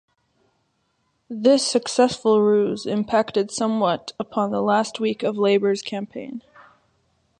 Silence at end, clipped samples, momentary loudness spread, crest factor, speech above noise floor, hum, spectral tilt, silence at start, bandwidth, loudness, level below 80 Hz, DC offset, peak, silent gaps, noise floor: 1 s; under 0.1%; 13 LU; 18 dB; 49 dB; none; -4.5 dB/octave; 1.3 s; 11 kHz; -21 LUFS; -66 dBFS; under 0.1%; -4 dBFS; none; -70 dBFS